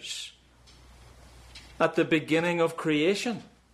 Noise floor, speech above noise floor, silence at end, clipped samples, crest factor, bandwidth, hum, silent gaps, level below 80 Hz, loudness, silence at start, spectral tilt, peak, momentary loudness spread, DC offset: -56 dBFS; 30 dB; 0.25 s; under 0.1%; 18 dB; 14 kHz; none; none; -58 dBFS; -27 LUFS; 0 s; -5 dB/octave; -12 dBFS; 21 LU; under 0.1%